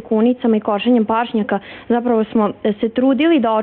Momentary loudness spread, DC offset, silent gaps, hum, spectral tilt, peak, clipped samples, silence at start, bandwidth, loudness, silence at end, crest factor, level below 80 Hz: 6 LU; under 0.1%; none; none; -9.5 dB/octave; -6 dBFS; under 0.1%; 0 s; 4.2 kHz; -17 LUFS; 0 s; 10 dB; -54 dBFS